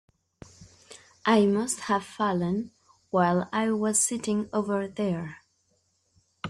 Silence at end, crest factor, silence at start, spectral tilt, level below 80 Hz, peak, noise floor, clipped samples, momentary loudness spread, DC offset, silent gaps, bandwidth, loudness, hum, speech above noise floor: 0 s; 20 dB; 0.6 s; -4.5 dB/octave; -66 dBFS; -10 dBFS; -71 dBFS; under 0.1%; 9 LU; under 0.1%; none; 14.5 kHz; -26 LUFS; none; 45 dB